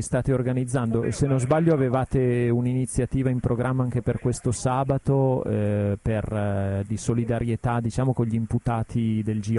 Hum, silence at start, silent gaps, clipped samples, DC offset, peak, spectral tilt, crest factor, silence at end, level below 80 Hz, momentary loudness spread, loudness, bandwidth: none; 0 s; none; under 0.1%; under 0.1%; -8 dBFS; -7.5 dB/octave; 16 dB; 0 s; -42 dBFS; 4 LU; -24 LUFS; 11.5 kHz